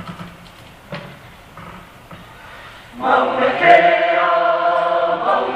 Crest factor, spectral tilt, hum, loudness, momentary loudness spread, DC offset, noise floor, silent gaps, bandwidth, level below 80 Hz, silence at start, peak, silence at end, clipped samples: 18 dB; -5 dB/octave; none; -15 LUFS; 26 LU; under 0.1%; -41 dBFS; none; 9.2 kHz; -52 dBFS; 0 s; 0 dBFS; 0 s; under 0.1%